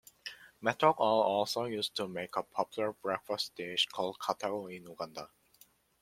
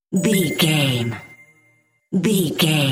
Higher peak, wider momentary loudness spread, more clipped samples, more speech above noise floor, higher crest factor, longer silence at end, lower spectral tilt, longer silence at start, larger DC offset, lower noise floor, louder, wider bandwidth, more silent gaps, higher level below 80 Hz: second, -10 dBFS vs -4 dBFS; first, 17 LU vs 9 LU; neither; second, 32 dB vs 42 dB; first, 24 dB vs 16 dB; first, 0.75 s vs 0 s; about the same, -3.5 dB/octave vs -4.5 dB/octave; first, 0.25 s vs 0.1 s; neither; first, -65 dBFS vs -60 dBFS; second, -33 LUFS vs -19 LUFS; about the same, 16.5 kHz vs 16.5 kHz; neither; second, -78 dBFS vs -58 dBFS